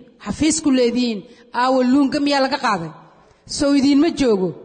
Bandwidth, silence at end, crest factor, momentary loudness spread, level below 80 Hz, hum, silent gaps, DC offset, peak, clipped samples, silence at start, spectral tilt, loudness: 9.4 kHz; 0 s; 12 dB; 12 LU; -48 dBFS; none; none; under 0.1%; -6 dBFS; under 0.1%; 0.2 s; -4 dB/octave; -18 LUFS